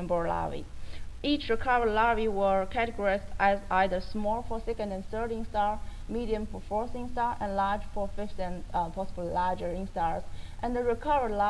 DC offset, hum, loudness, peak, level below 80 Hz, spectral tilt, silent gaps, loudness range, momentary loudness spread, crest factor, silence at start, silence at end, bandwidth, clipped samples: under 0.1%; none; -31 LUFS; -12 dBFS; -40 dBFS; -6 dB/octave; none; 5 LU; 10 LU; 16 dB; 0 s; 0 s; 11 kHz; under 0.1%